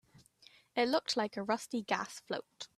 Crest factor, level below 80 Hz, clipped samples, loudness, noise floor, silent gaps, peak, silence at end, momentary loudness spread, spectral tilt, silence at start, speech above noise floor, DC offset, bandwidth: 22 dB; -80 dBFS; under 0.1%; -35 LUFS; -64 dBFS; none; -16 dBFS; 0.1 s; 10 LU; -3.5 dB/octave; 0.75 s; 28 dB; under 0.1%; 14 kHz